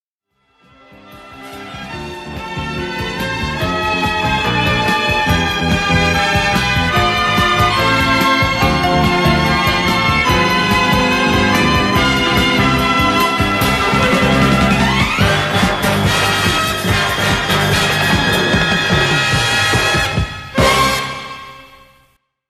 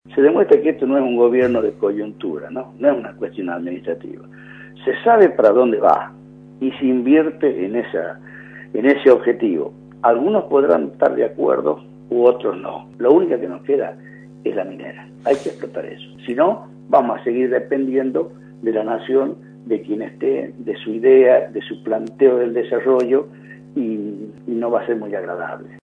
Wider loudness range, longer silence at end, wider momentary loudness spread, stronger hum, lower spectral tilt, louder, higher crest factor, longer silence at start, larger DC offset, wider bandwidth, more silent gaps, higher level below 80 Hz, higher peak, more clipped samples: about the same, 5 LU vs 5 LU; first, 0.85 s vs 0.05 s; second, 9 LU vs 16 LU; neither; second, -4 dB/octave vs -7.5 dB/octave; first, -13 LUFS vs -18 LUFS; about the same, 14 dB vs 18 dB; first, 1.05 s vs 0.1 s; neither; first, 15.5 kHz vs 6.8 kHz; neither; first, -30 dBFS vs -62 dBFS; about the same, 0 dBFS vs 0 dBFS; neither